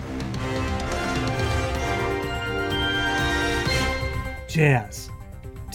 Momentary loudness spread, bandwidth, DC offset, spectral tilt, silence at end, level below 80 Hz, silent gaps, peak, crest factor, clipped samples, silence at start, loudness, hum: 13 LU; 17 kHz; under 0.1%; -5 dB/octave; 0 s; -34 dBFS; none; -4 dBFS; 20 dB; under 0.1%; 0 s; -24 LUFS; none